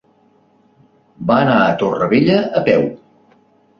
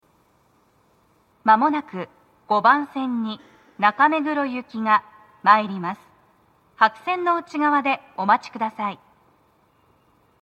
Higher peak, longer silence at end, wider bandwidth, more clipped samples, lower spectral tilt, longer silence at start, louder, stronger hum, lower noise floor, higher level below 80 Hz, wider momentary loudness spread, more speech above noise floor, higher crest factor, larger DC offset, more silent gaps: about the same, -2 dBFS vs 0 dBFS; second, 0.85 s vs 1.5 s; second, 6.8 kHz vs 8.4 kHz; neither; first, -8 dB/octave vs -6 dB/octave; second, 1.2 s vs 1.45 s; first, -15 LUFS vs -21 LUFS; neither; second, -54 dBFS vs -61 dBFS; first, -52 dBFS vs -74 dBFS; second, 5 LU vs 14 LU; about the same, 40 dB vs 40 dB; second, 16 dB vs 22 dB; neither; neither